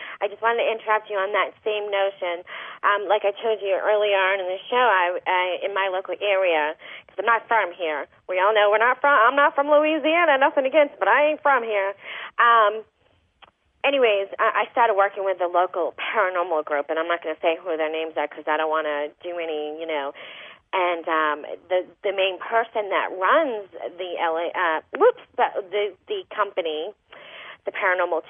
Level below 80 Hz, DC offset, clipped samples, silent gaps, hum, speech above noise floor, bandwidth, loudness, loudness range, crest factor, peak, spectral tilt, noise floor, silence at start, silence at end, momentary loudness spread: -78 dBFS; under 0.1%; under 0.1%; none; none; 37 dB; 3.7 kHz; -22 LUFS; 7 LU; 16 dB; -6 dBFS; -6 dB/octave; -60 dBFS; 0 s; 0.1 s; 12 LU